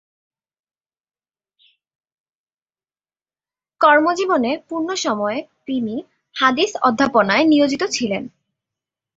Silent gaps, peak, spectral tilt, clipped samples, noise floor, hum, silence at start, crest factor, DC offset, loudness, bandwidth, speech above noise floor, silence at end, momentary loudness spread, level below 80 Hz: none; -2 dBFS; -3.5 dB/octave; under 0.1%; under -90 dBFS; none; 3.8 s; 20 dB; under 0.1%; -18 LUFS; 8 kHz; over 72 dB; 0.9 s; 13 LU; -62 dBFS